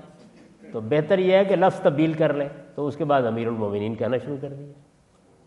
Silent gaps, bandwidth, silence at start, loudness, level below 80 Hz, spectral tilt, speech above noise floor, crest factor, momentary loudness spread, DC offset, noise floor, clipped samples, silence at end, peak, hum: none; 10.5 kHz; 0.05 s; -23 LUFS; -66 dBFS; -8 dB/octave; 35 dB; 18 dB; 15 LU; under 0.1%; -58 dBFS; under 0.1%; 0.75 s; -6 dBFS; none